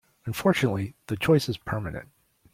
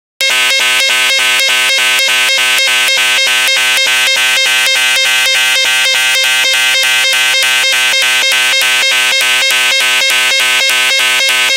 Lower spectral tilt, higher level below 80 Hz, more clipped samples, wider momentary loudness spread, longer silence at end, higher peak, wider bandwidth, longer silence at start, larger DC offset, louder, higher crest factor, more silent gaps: first, -6 dB/octave vs 3 dB/octave; first, -54 dBFS vs -74 dBFS; neither; first, 12 LU vs 0 LU; first, 0.5 s vs 0 s; second, -10 dBFS vs 0 dBFS; about the same, 16.5 kHz vs 17.5 kHz; about the same, 0.25 s vs 0.2 s; neither; second, -26 LUFS vs -7 LUFS; first, 18 dB vs 10 dB; neither